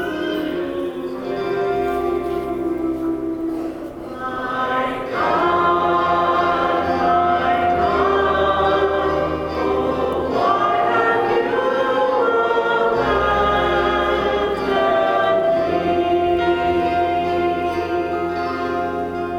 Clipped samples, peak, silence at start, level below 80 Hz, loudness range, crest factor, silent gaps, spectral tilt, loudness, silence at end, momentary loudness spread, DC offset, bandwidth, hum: under 0.1%; -4 dBFS; 0 s; -42 dBFS; 6 LU; 14 dB; none; -6.5 dB/octave; -19 LUFS; 0 s; 7 LU; under 0.1%; 15.5 kHz; none